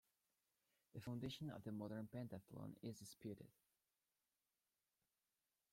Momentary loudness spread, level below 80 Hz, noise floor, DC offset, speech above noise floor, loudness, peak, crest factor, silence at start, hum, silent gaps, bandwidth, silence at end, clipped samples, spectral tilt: 7 LU; -82 dBFS; under -90 dBFS; under 0.1%; over 37 dB; -54 LUFS; -38 dBFS; 18 dB; 0.95 s; none; none; 16.5 kHz; 2.2 s; under 0.1%; -6 dB/octave